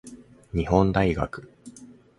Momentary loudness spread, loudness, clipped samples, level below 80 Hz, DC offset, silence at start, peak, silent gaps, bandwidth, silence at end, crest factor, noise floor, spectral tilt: 23 LU; -24 LUFS; under 0.1%; -40 dBFS; under 0.1%; 0.05 s; -4 dBFS; none; 11.5 kHz; 0.25 s; 22 dB; -48 dBFS; -7.5 dB/octave